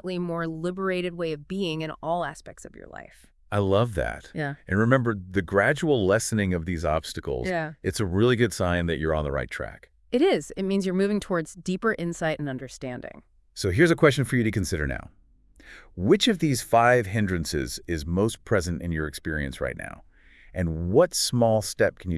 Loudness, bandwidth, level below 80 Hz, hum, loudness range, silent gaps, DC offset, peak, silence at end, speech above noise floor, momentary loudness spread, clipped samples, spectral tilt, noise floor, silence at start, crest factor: -25 LUFS; 12 kHz; -46 dBFS; none; 5 LU; none; under 0.1%; -4 dBFS; 0 s; 30 dB; 14 LU; under 0.1%; -5.5 dB/octave; -55 dBFS; 0.05 s; 20 dB